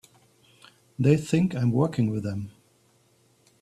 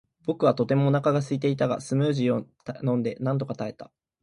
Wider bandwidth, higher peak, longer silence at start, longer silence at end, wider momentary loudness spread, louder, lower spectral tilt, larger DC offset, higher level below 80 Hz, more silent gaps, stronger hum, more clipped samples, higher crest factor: first, 13 kHz vs 11 kHz; about the same, -8 dBFS vs -6 dBFS; first, 1 s vs 0.25 s; first, 1.1 s vs 0.4 s; first, 15 LU vs 10 LU; about the same, -25 LUFS vs -26 LUFS; about the same, -8 dB/octave vs -7.5 dB/octave; neither; first, -58 dBFS vs -66 dBFS; neither; neither; neither; about the same, 20 dB vs 18 dB